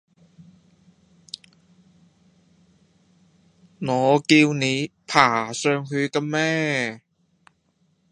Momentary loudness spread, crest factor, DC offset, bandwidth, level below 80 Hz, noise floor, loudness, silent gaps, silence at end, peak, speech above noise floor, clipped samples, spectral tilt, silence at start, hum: 23 LU; 24 dB; under 0.1%; 11 kHz; -68 dBFS; -66 dBFS; -21 LUFS; none; 1.15 s; 0 dBFS; 46 dB; under 0.1%; -4.5 dB/octave; 3.8 s; none